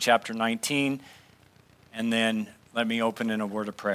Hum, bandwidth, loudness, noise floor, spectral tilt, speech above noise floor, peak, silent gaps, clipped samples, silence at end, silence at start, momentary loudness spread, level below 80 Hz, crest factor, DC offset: none; 16 kHz; -28 LUFS; -58 dBFS; -3.5 dB/octave; 31 dB; -8 dBFS; none; under 0.1%; 0 s; 0 s; 9 LU; -70 dBFS; 20 dB; under 0.1%